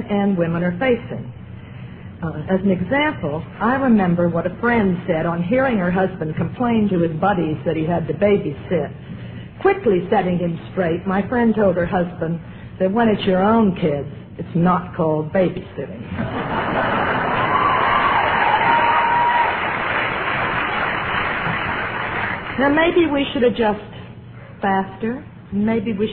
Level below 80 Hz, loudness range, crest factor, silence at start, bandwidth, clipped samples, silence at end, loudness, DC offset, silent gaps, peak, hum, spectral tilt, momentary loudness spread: -44 dBFS; 4 LU; 16 dB; 0 s; 4.7 kHz; under 0.1%; 0 s; -19 LUFS; under 0.1%; none; -4 dBFS; none; -10.5 dB/octave; 13 LU